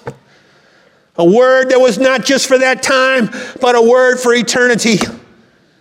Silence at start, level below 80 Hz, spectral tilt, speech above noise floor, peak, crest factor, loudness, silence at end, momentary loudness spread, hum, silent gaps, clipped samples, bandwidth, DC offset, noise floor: 0.05 s; -54 dBFS; -3.5 dB/octave; 39 dB; 0 dBFS; 12 dB; -11 LUFS; 0.6 s; 7 LU; none; none; under 0.1%; 15.5 kHz; under 0.1%; -49 dBFS